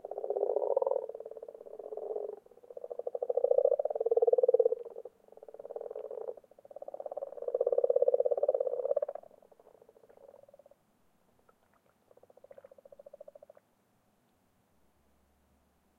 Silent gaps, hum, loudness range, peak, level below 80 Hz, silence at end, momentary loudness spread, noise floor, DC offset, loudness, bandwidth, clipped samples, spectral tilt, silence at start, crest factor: none; none; 7 LU; -12 dBFS; -84 dBFS; 5.7 s; 23 LU; -72 dBFS; under 0.1%; -32 LUFS; 2 kHz; under 0.1%; -7 dB/octave; 0.05 s; 22 dB